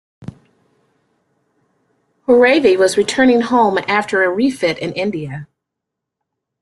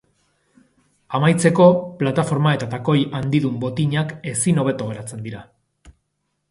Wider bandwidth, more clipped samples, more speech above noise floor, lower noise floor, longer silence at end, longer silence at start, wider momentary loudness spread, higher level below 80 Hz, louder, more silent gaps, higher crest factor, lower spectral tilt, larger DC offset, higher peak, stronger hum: about the same, 12 kHz vs 11.5 kHz; neither; first, 66 dB vs 54 dB; first, -80 dBFS vs -73 dBFS; first, 1.15 s vs 0.6 s; second, 0.2 s vs 1.1 s; first, 19 LU vs 15 LU; about the same, -56 dBFS vs -56 dBFS; first, -14 LUFS vs -19 LUFS; neither; about the same, 16 dB vs 20 dB; second, -4.5 dB/octave vs -6 dB/octave; neither; about the same, 0 dBFS vs -2 dBFS; neither